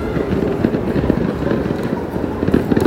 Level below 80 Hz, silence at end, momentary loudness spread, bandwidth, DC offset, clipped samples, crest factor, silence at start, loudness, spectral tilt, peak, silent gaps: -32 dBFS; 0 s; 4 LU; 16.5 kHz; under 0.1%; under 0.1%; 16 dB; 0 s; -19 LUFS; -8.5 dB/octave; 0 dBFS; none